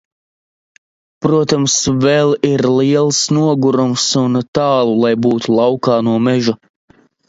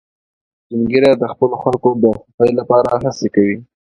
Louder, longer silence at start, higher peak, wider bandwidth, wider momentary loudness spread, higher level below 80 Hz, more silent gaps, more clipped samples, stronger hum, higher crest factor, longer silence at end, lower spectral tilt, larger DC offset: about the same, -13 LUFS vs -15 LUFS; first, 1.2 s vs 0.7 s; about the same, 0 dBFS vs 0 dBFS; second, 8 kHz vs 10.5 kHz; second, 3 LU vs 6 LU; about the same, -50 dBFS vs -48 dBFS; about the same, 4.48-4.53 s vs 2.34-2.38 s; neither; neither; about the same, 14 dB vs 16 dB; first, 0.75 s vs 0.35 s; second, -5 dB/octave vs -7 dB/octave; neither